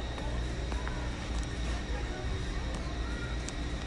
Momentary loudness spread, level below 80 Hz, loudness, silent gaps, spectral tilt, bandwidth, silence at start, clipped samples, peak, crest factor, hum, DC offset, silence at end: 1 LU; -36 dBFS; -37 LUFS; none; -5 dB/octave; 11 kHz; 0 s; under 0.1%; -20 dBFS; 16 dB; none; under 0.1%; 0 s